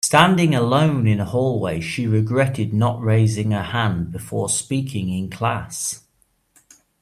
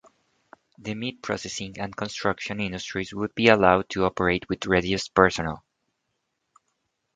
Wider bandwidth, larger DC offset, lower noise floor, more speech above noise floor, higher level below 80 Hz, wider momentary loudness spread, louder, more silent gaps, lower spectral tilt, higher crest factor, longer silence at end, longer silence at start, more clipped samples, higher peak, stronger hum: first, 14.5 kHz vs 9.4 kHz; neither; second, -64 dBFS vs -78 dBFS; second, 45 dB vs 53 dB; about the same, -52 dBFS vs -50 dBFS; second, 9 LU vs 14 LU; first, -20 LUFS vs -24 LUFS; neither; about the same, -5 dB/octave vs -5 dB/octave; second, 20 dB vs 26 dB; second, 1.05 s vs 1.55 s; second, 0.05 s vs 0.85 s; neither; about the same, 0 dBFS vs 0 dBFS; neither